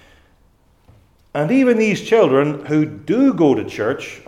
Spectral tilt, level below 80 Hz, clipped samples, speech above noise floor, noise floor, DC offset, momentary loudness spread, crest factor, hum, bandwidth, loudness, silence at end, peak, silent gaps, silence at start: -6.5 dB/octave; -56 dBFS; under 0.1%; 39 dB; -55 dBFS; under 0.1%; 8 LU; 16 dB; none; 11.5 kHz; -16 LUFS; 0.1 s; -2 dBFS; none; 1.35 s